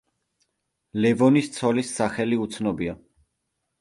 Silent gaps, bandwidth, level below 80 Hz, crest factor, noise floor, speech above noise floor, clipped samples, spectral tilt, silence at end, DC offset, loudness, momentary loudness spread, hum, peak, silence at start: none; 11.5 kHz; -58 dBFS; 18 dB; -78 dBFS; 56 dB; under 0.1%; -6 dB/octave; 0.85 s; under 0.1%; -23 LUFS; 12 LU; none; -6 dBFS; 0.95 s